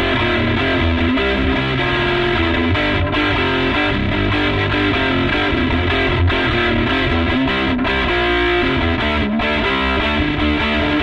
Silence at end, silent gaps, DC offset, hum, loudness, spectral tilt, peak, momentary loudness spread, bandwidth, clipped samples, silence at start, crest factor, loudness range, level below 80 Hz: 0 s; none; under 0.1%; none; -16 LUFS; -7 dB/octave; -4 dBFS; 1 LU; 8.4 kHz; under 0.1%; 0 s; 12 dB; 0 LU; -26 dBFS